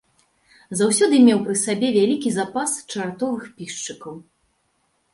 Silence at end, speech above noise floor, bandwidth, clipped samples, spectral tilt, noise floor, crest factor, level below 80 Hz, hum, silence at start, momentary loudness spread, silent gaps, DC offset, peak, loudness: 0.9 s; 48 dB; 11.5 kHz; under 0.1%; -4 dB/octave; -68 dBFS; 18 dB; -66 dBFS; none; 0.7 s; 16 LU; none; under 0.1%; -4 dBFS; -20 LUFS